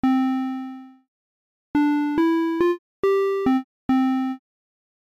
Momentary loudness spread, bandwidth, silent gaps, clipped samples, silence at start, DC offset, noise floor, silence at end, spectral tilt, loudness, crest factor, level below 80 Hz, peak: 10 LU; 7.4 kHz; 1.08-1.74 s, 2.79-3.03 s, 3.64-3.89 s; under 0.1%; 0.05 s; under 0.1%; under -90 dBFS; 0.8 s; -6.5 dB/octave; -22 LUFS; 10 dB; -58 dBFS; -14 dBFS